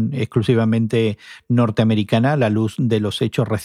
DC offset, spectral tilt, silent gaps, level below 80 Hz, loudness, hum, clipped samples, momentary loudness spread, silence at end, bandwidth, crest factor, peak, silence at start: under 0.1%; -7.5 dB/octave; none; -56 dBFS; -18 LUFS; none; under 0.1%; 4 LU; 0 s; 13 kHz; 14 dB; -4 dBFS; 0 s